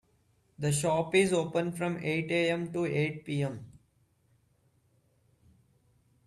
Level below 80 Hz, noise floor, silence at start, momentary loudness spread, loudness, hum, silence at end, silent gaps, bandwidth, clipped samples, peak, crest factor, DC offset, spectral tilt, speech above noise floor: -68 dBFS; -70 dBFS; 0.6 s; 8 LU; -30 LUFS; none; 2.55 s; none; 14 kHz; under 0.1%; -12 dBFS; 20 dB; under 0.1%; -5 dB/octave; 40 dB